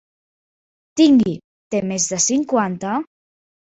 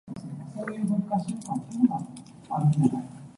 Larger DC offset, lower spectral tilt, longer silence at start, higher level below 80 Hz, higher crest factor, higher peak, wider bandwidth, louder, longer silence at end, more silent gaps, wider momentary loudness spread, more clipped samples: neither; second, -4 dB/octave vs -8.5 dB/octave; first, 0.95 s vs 0.05 s; about the same, -60 dBFS vs -64 dBFS; about the same, 18 dB vs 20 dB; first, -2 dBFS vs -8 dBFS; second, 8.2 kHz vs 11.5 kHz; first, -18 LUFS vs -28 LUFS; first, 0.75 s vs 0.05 s; first, 1.44-1.71 s vs none; about the same, 14 LU vs 15 LU; neither